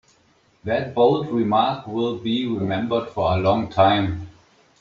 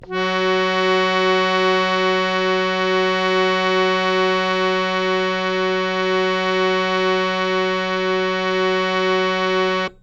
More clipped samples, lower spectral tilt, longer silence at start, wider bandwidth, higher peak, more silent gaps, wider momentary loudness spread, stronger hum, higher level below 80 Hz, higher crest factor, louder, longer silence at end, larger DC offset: neither; about the same, -5 dB/octave vs -5 dB/octave; first, 0.65 s vs 0 s; about the same, 7.4 kHz vs 8 kHz; about the same, -4 dBFS vs -4 dBFS; neither; first, 8 LU vs 3 LU; neither; about the same, -52 dBFS vs -52 dBFS; about the same, 18 dB vs 16 dB; second, -21 LUFS vs -18 LUFS; first, 0.5 s vs 0.1 s; neither